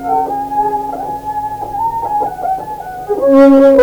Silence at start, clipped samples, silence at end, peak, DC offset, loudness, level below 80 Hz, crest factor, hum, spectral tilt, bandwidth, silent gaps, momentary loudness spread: 0 s; 0.1%; 0 s; 0 dBFS; under 0.1%; -13 LUFS; -42 dBFS; 12 dB; none; -7 dB/octave; over 20 kHz; none; 15 LU